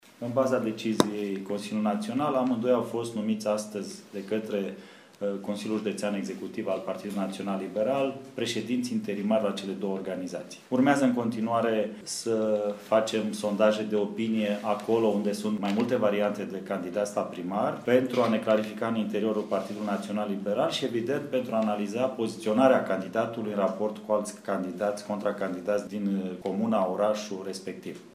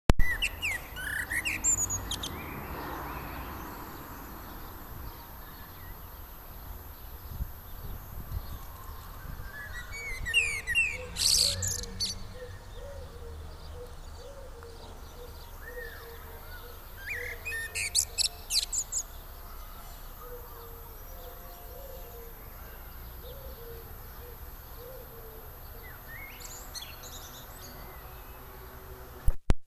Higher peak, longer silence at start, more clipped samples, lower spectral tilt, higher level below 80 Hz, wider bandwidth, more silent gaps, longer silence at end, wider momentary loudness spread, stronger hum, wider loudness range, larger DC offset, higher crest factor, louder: about the same, -2 dBFS vs -2 dBFS; about the same, 0.2 s vs 0.1 s; neither; first, -5.5 dB/octave vs -1.5 dB/octave; second, -76 dBFS vs -40 dBFS; second, 15 kHz vs over 20 kHz; neither; about the same, 0.05 s vs 0 s; second, 8 LU vs 19 LU; neither; second, 4 LU vs 17 LU; neither; second, 26 dB vs 32 dB; first, -29 LUFS vs -32 LUFS